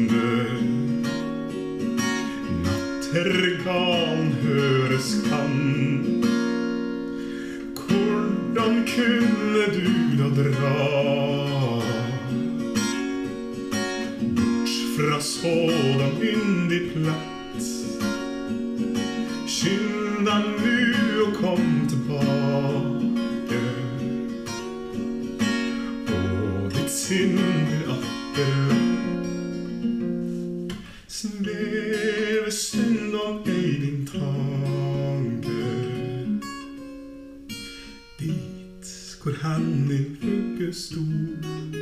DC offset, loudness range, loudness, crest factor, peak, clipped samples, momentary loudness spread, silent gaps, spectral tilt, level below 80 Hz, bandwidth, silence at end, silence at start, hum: under 0.1%; 6 LU; -24 LUFS; 16 dB; -8 dBFS; under 0.1%; 10 LU; none; -5.5 dB/octave; -54 dBFS; 15 kHz; 0 s; 0 s; none